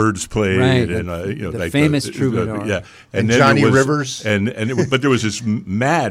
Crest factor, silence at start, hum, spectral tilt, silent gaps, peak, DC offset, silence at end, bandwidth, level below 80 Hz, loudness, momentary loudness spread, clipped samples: 14 dB; 0 s; none; -5.5 dB/octave; none; -4 dBFS; under 0.1%; 0 s; 15 kHz; -44 dBFS; -17 LUFS; 10 LU; under 0.1%